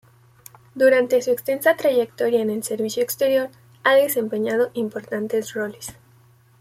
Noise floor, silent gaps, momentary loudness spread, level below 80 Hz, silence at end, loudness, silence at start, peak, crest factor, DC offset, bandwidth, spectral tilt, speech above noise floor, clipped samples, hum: -54 dBFS; none; 11 LU; -66 dBFS; 0.7 s; -21 LUFS; 0.75 s; -4 dBFS; 18 dB; under 0.1%; 16.5 kHz; -3.5 dB/octave; 34 dB; under 0.1%; none